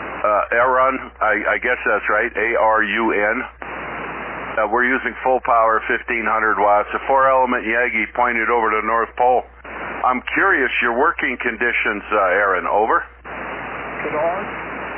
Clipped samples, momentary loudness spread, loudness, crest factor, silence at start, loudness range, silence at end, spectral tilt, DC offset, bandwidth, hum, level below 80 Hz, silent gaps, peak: under 0.1%; 12 LU; -18 LUFS; 14 dB; 0 s; 2 LU; 0 s; -7.5 dB/octave; under 0.1%; 3.5 kHz; none; -46 dBFS; none; -4 dBFS